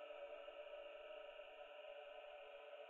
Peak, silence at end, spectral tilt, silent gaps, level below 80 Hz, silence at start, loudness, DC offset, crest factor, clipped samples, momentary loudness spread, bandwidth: -44 dBFS; 0 s; 2.5 dB/octave; none; -84 dBFS; 0 s; -56 LUFS; under 0.1%; 12 dB; under 0.1%; 3 LU; 7 kHz